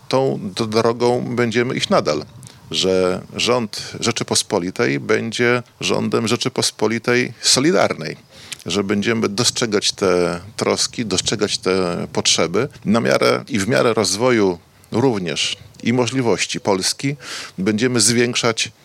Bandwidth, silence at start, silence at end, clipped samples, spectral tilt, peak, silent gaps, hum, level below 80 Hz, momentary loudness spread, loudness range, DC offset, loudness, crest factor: 16.5 kHz; 0.1 s; 0.15 s; under 0.1%; -3.5 dB/octave; 0 dBFS; none; none; -56 dBFS; 7 LU; 2 LU; under 0.1%; -18 LUFS; 18 dB